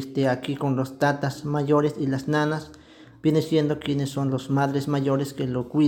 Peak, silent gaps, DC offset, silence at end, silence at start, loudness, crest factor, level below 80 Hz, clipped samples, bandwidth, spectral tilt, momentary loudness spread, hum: -8 dBFS; none; under 0.1%; 0 s; 0 s; -25 LUFS; 16 dB; -60 dBFS; under 0.1%; 17 kHz; -7 dB/octave; 5 LU; none